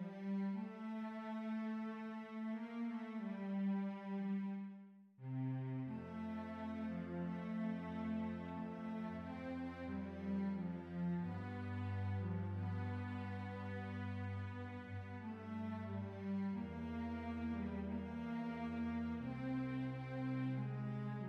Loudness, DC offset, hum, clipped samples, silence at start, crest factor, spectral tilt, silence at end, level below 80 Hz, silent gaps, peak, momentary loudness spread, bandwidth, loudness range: -45 LUFS; under 0.1%; none; under 0.1%; 0 s; 12 dB; -9 dB/octave; 0 s; -70 dBFS; none; -32 dBFS; 5 LU; 6.4 kHz; 2 LU